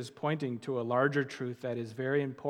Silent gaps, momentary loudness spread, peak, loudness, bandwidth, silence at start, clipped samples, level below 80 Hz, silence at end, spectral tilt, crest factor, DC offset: none; 9 LU; -14 dBFS; -33 LUFS; 12 kHz; 0 s; under 0.1%; -84 dBFS; 0 s; -7 dB/octave; 18 dB; under 0.1%